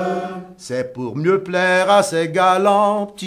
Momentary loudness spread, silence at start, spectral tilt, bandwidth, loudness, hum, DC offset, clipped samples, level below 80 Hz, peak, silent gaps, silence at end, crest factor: 12 LU; 0 s; -4.5 dB/octave; 15.5 kHz; -17 LUFS; none; under 0.1%; under 0.1%; -62 dBFS; -2 dBFS; none; 0 s; 16 dB